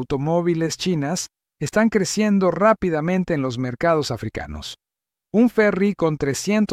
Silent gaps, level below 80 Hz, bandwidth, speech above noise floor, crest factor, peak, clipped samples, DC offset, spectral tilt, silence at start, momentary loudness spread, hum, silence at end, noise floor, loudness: none; -48 dBFS; 15 kHz; 37 dB; 16 dB; -4 dBFS; under 0.1%; under 0.1%; -5.5 dB/octave; 0 s; 13 LU; none; 0 s; -57 dBFS; -21 LUFS